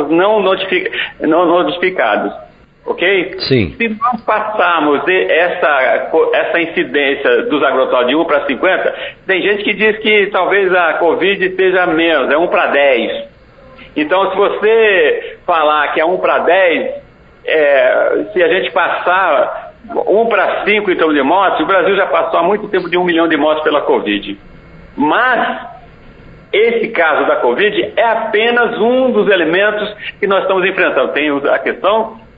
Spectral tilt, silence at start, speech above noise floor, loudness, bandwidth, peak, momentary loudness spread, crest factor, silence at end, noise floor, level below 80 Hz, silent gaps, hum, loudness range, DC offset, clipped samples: -2 dB/octave; 0 s; 28 dB; -12 LUFS; 5.2 kHz; 0 dBFS; 7 LU; 12 dB; 0.2 s; -40 dBFS; -48 dBFS; none; none; 2 LU; under 0.1%; under 0.1%